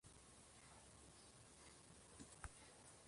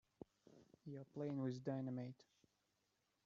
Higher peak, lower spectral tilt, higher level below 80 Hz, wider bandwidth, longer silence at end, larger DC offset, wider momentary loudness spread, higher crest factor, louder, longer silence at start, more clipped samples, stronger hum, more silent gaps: second, -36 dBFS vs -30 dBFS; second, -3 dB/octave vs -8.5 dB/octave; first, -72 dBFS vs -88 dBFS; first, 11.5 kHz vs 7.4 kHz; second, 0 s vs 1.1 s; neither; second, 5 LU vs 19 LU; first, 28 dB vs 20 dB; second, -62 LUFS vs -48 LUFS; second, 0.05 s vs 0.45 s; neither; neither; neither